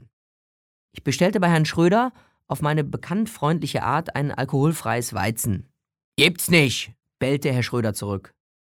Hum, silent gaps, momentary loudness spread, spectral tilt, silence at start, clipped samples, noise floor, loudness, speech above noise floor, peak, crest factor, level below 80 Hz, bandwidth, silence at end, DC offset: none; 6.04-6.12 s; 11 LU; -5 dB/octave; 0.95 s; under 0.1%; under -90 dBFS; -22 LUFS; over 68 dB; -2 dBFS; 22 dB; -56 dBFS; 18.5 kHz; 0.45 s; under 0.1%